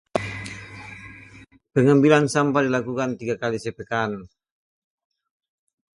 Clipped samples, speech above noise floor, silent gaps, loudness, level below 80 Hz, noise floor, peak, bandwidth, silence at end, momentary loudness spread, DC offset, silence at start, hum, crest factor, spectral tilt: under 0.1%; 28 dB; none; -22 LUFS; -56 dBFS; -48 dBFS; -2 dBFS; 11.5 kHz; 1.7 s; 22 LU; under 0.1%; 0.15 s; none; 22 dB; -6 dB/octave